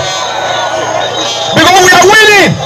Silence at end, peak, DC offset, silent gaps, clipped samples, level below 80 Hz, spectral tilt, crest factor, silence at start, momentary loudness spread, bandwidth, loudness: 0 s; 0 dBFS; under 0.1%; none; 1%; -40 dBFS; -2.5 dB/octave; 8 dB; 0 s; 11 LU; 15 kHz; -6 LUFS